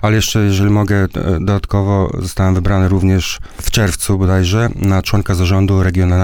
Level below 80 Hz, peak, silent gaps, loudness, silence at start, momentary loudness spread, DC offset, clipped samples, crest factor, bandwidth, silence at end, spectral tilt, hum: -26 dBFS; -2 dBFS; none; -14 LUFS; 0 s; 4 LU; 0.4%; under 0.1%; 12 dB; 17.5 kHz; 0 s; -6 dB/octave; none